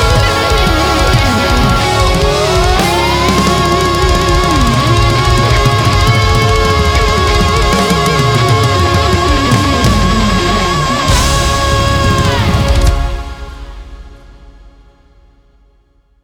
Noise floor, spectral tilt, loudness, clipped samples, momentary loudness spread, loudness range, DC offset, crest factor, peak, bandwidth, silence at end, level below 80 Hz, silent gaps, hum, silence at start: -51 dBFS; -4.5 dB/octave; -10 LUFS; under 0.1%; 2 LU; 5 LU; under 0.1%; 10 dB; 0 dBFS; 19 kHz; 1.55 s; -18 dBFS; none; none; 0 s